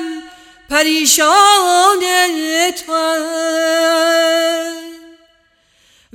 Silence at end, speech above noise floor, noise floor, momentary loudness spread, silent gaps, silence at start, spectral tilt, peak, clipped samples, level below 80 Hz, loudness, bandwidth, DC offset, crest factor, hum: 1.15 s; 43 dB; -56 dBFS; 11 LU; none; 0 s; 1 dB/octave; 0 dBFS; under 0.1%; -56 dBFS; -12 LUFS; 18 kHz; under 0.1%; 14 dB; none